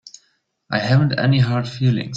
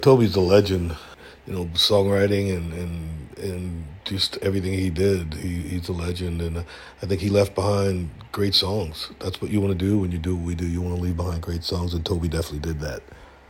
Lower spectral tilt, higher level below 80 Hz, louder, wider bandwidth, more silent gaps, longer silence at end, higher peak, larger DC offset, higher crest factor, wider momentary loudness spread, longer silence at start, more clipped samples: about the same, -7 dB/octave vs -6 dB/octave; second, -52 dBFS vs -40 dBFS; first, -18 LUFS vs -24 LUFS; second, 7.6 kHz vs 16.5 kHz; neither; second, 0 s vs 0.2 s; about the same, -4 dBFS vs -2 dBFS; neither; second, 14 dB vs 20 dB; second, 6 LU vs 14 LU; first, 0.7 s vs 0 s; neither